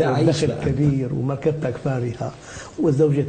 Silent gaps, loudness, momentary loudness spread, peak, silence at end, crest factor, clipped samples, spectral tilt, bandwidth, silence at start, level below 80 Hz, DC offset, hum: none; -22 LUFS; 12 LU; -6 dBFS; 0 s; 16 dB; under 0.1%; -7.5 dB/octave; 9.2 kHz; 0 s; -44 dBFS; under 0.1%; none